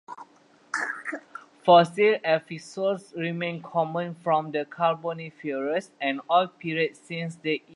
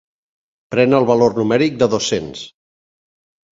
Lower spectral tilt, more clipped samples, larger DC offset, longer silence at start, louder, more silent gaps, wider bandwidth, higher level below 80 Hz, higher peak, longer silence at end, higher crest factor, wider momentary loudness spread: about the same, -5.5 dB/octave vs -5 dB/octave; neither; neither; second, 0.1 s vs 0.7 s; second, -26 LUFS vs -16 LUFS; neither; first, 11 kHz vs 7.8 kHz; second, -78 dBFS vs -54 dBFS; second, -6 dBFS vs 0 dBFS; second, 0.15 s vs 1.05 s; about the same, 20 dB vs 18 dB; second, 14 LU vs 17 LU